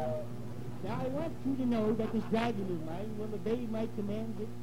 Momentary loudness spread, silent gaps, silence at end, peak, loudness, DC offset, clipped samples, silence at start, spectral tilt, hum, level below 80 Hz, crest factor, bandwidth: 9 LU; none; 0 s; -18 dBFS; -36 LUFS; 0.9%; under 0.1%; 0 s; -7.5 dB/octave; 60 Hz at -45 dBFS; -56 dBFS; 18 dB; 16 kHz